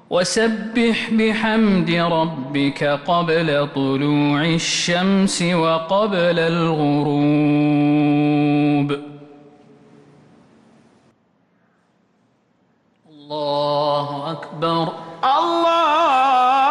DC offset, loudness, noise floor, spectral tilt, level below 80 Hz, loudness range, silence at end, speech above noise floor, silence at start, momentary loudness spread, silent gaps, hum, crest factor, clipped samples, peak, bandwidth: under 0.1%; -18 LUFS; -61 dBFS; -5.5 dB/octave; -54 dBFS; 9 LU; 0 s; 44 dB; 0.1 s; 7 LU; none; none; 12 dB; under 0.1%; -8 dBFS; 11.5 kHz